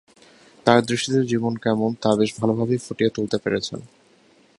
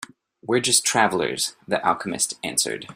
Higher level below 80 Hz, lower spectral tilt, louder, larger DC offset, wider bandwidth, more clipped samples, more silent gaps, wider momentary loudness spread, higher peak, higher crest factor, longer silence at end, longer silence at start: first, -58 dBFS vs -64 dBFS; first, -5.5 dB/octave vs -2 dB/octave; about the same, -22 LUFS vs -21 LUFS; neither; second, 11.5 kHz vs 16 kHz; neither; neither; about the same, 7 LU vs 8 LU; first, 0 dBFS vs -4 dBFS; about the same, 22 dB vs 20 dB; first, 0.7 s vs 0 s; first, 0.65 s vs 0 s